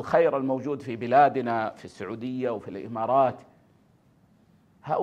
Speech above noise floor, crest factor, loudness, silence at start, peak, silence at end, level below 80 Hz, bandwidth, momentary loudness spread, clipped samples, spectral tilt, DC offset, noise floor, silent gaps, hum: 36 dB; 20 dB; -26 LUFS; 0 s; -6 dBFS; 0 s; -70 dBFS; 9.2 kHz; 16 LU; under 0.1%; -7.5 dB/octave; under 0.1%; -61 dBFS; none; none